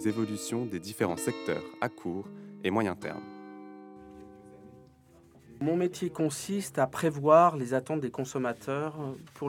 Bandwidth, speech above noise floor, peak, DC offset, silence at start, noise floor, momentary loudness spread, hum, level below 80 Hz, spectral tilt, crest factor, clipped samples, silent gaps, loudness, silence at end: 18.5 kHz; 29 dB; -8 dBFS; under 0.1%; 0 s; -58 dBFS; 21 LU; none; -70 dBFS; -5.5 dB/octave; 24 dB; under 0.1%; none; -30 LUFS; 0 s